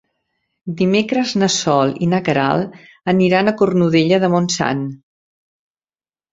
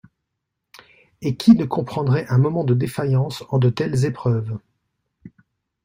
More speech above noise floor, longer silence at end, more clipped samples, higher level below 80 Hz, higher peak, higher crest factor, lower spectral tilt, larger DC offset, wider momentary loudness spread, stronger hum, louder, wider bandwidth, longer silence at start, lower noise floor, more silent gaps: first, over 74 dB vs 60 dB; first, 1.35 s vs 0.55 s; neither; about the same, -56 dBFS vs -56 dBFS; about the same, -2 dBFS vs -2 dBFS; about the same, 16 dB vs 18 dB; second, -5 dB/octave vs -8 dB/octave; neither; about the same, 11 LU vs 10 LU; neither; first, -16 LUFS vs -20 LUFS; second, 7.8 kHz vs 15.5 kHz; second, 0.65 s vs 1.2 s; first, under -90 dBFS vs -79 dBFS; neither